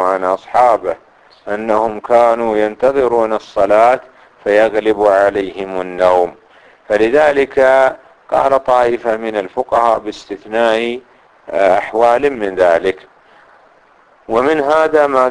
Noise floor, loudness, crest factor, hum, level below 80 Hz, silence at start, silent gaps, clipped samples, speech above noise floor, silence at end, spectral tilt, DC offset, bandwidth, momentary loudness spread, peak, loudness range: -49 dBFS; -14 LUFS; 14 dB; none; -48 dBFS; 0 s; none; under 0.1%; 36 dB; 0 s; -5 dB/octave; under 0.1%; 10.5 kHz; 11 LU; 0 dBFS; 3 LU